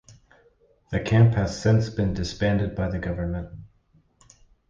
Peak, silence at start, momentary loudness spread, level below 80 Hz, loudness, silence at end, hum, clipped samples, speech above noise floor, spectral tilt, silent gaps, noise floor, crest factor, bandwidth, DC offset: -6 dBFS; 0.9 s; 12 LU; -40 dBFS; -24 LUFS; 1.05 s; none; under 0.1%; 40 dB; -7 dB/octave; none; -62 dBFS; 18 dB; 7.6 kHz; under 0.1%